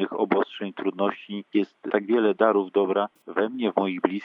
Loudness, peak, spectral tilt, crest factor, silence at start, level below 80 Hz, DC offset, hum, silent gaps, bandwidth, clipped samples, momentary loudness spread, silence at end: -25 LUFS; -6 dBFS; -8 dB/octave; 20 dB; 0 s; -90 dBFS; under 0.1%; none; none; 5.2 kHz; under 0.1%; 8 LU; 0 s